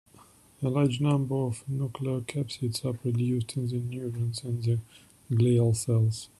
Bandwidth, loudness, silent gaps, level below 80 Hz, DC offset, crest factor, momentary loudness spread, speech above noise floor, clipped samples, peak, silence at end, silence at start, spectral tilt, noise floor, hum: 12.5 kHz; -29 LUFS; none; -62 dBFS; under 0.1%; 16 dB; 8 LU; 29 dB; under 0.1%; -12 dBFS; 0.15 s; 0.6 s; -7 dB/octave; -57 dBFS; none